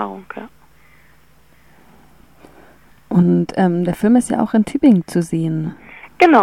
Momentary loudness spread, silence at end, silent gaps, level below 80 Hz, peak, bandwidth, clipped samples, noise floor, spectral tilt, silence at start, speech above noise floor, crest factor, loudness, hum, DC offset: 19 LU; 0 s; none; -50 dBFS; 0 dBFS; 13 kHz; under 0.1%; -53 dBFS; -7 dB/octave; 0 s; 37 dB; 18 dB; -16 LUFS; none; 0.3%